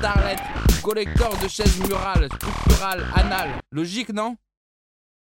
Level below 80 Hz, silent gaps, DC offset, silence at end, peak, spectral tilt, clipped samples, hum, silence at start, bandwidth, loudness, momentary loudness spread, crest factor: -26 dBFS; none; under 0.1%; 1 s; -2 dBFS; -5 dB/octave; under 0.1%; none; 0 s; 16.5 kHz; -23 LUFS; 7 LU; 20 dB